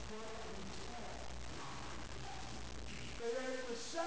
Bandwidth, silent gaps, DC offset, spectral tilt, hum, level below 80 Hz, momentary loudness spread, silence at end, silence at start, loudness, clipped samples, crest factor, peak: 8 kHz; none; 0.4%; -3.5 dB/octave; none; -56 dBFS; 7 LU; 0 s; 0 s; -47 LUFS; under 0.1%; 18 dB; -28 dBFS